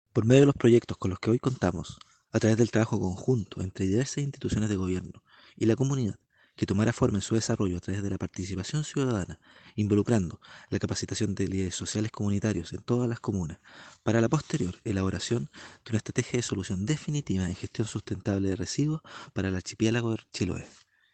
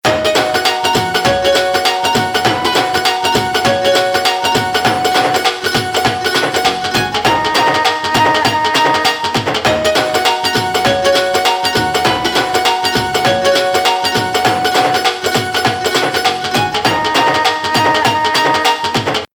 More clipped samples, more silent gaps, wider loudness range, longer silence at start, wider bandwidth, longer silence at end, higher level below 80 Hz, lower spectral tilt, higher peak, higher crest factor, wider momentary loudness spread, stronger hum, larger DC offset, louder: neither; neither; about the same, 3 LU vs 1 LU; about the same, 0.15 s vs 0.05 s; second, 9.2 kHz vs 19 kHz; first, 0.45 s vs 0.1 s; second, -54 dBFS vs -44 dBFS; first, -6 dB/octave vs -3 dB/octave; second, -8 dBFS vs 0 dBFS; first, 20 dB vs 14 dB; first, 10 LU vs 2 LU; neither; neither; second, -29 LUFS vs -13 LUFS